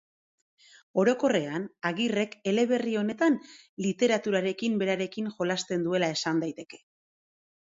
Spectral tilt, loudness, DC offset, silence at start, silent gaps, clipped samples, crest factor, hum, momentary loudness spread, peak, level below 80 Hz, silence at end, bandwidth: -5 dB/octave; -28 LUFS; under 0.1%; 0.95 s; 3.69-3.77 s; under 0.1%; 18 dB; none; 8 LU; -12 dBFS; -74 dBFS; 0.95 s; 7.8 kHz